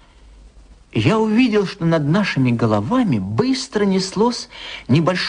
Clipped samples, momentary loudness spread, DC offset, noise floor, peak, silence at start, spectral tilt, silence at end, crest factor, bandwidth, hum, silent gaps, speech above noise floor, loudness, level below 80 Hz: under 0.1%; 4 LU; under 0.1%; -45 dBFS; -4 dBFS; 0.45 s; -6 dB/octave; 0 s; 14 dB; 10 kHz; none; none; 27 dB; -18 LUFS; -48 dBFS